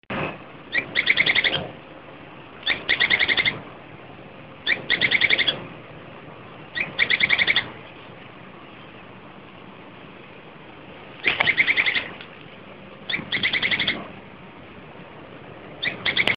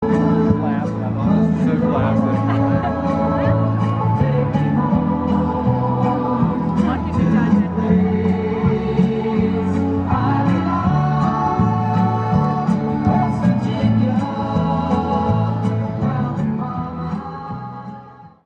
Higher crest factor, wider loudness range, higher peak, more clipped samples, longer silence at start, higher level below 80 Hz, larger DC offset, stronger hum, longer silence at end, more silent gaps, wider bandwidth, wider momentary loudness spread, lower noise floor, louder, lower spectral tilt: first, 26 dB vs 14 dB; first, 6 LU vs 2 LU; about the same, 0 dBFS vs -2 dBFS; neither; about the same, 0.1 s vs 0 s; second, -56 dBFS vs -38 dBFS; first, 0.2% vs under 0.1%; neither; second, 0 s vs 0.2 s; neither; second, 6.4 kHz vs 7.8 kHz; first, 25 LU vs 5 LU; about the same, -43 dBFS vs -40 dBFS; second, -21 LUFS vs -18 LUFS; second, 0.5 dB/octave vs -9.5 dB/octave